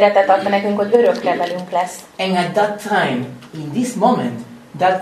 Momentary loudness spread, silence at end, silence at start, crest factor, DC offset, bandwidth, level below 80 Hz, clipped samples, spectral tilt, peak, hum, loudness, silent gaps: 11 LU; 0 s; 0 s; 16 dB; under 0.1%; 13 kHz; -62 dBFS; under 0.1%; -5.5 dB/octave; 0 dBFS; none; -17 LUFS; none